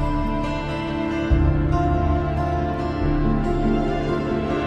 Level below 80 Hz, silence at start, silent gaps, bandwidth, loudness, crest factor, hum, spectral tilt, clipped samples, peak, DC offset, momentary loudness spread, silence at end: -26 dBFS; 0 s; none; 8.4 kHz; -22 LUFS; 14 dB; none; -8.5 dB/octave; under 0.1%; -6 dBFS; under 0.1%; 5 LU; 0 s